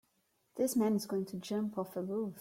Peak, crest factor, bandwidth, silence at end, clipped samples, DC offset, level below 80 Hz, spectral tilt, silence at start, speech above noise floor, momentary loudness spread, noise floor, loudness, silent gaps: -22 dBFS; 14 dB; 16.5 kHz; 0 s; under 0.1%; under 0.1%; -78 dBFS; -6 dB/octave; 0.55 s; 42 dB; 7 LU; -77 dBFS; -35 LUFS; none